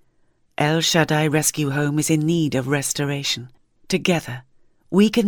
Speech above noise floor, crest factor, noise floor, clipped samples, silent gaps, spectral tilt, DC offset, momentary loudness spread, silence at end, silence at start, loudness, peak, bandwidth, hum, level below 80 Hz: 41 dB; 18 dB; -61 dBFS; under 0.1%; none; -4.5 dB/octave; under 0.1%; 8 LU; 0 s; 0.6 s; -20 LUFS; -4 dBFS; 18.5 kHz; none; -56 dBFS